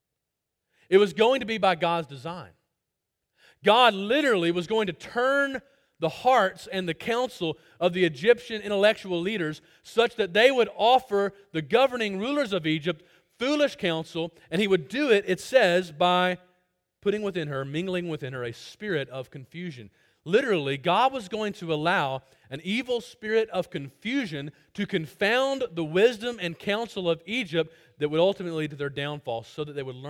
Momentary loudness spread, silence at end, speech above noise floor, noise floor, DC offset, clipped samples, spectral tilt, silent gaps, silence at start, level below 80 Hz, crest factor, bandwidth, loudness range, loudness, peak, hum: 13 LU; 0 s; 58 dB; -84 dBFS; under 0.1%; under 0.1%; -5 dB/octave; none; 0.9 s; -66 dBFS; 20 dB; 16.5 kHz; 5 LU; -26 LUFS; -6 dBFS; none